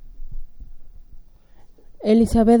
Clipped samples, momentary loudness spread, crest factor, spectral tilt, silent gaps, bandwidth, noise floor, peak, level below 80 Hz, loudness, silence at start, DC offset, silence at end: under 0.1%; 27 LU; 16 dB; -7.5 dB/octave; none; 15.5 kHz; -45 dBFS; -4 dBFS; -34 dBFS; -18 LUFS; 0.05 s; under 0.1%; 0 s